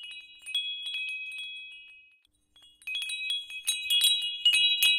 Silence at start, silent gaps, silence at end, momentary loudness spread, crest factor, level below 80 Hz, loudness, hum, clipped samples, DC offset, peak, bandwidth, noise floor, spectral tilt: 0 s; none; 0 s; 21 LU; 20 dB; -76 dBFS; -26 LUFS; 50 Hz at -90 dBFS; under 0.1%; under 0.1%; -10 dBFS; 17.5 kHz; -66 dBFS; 6 dB/octave